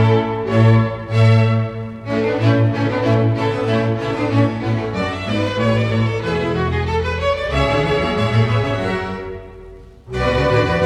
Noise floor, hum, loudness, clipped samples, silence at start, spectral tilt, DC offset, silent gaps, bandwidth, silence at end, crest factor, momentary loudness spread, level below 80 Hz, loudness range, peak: -38 dBFS; none; -18 LUFS; under 0.1%; 0 s; -7.5 dB/octave; under 0.1%; none; 8.6 kHz; 0 s; 16 dB; 8 LU; -34 dBFS; 3 LU; -2 dBFS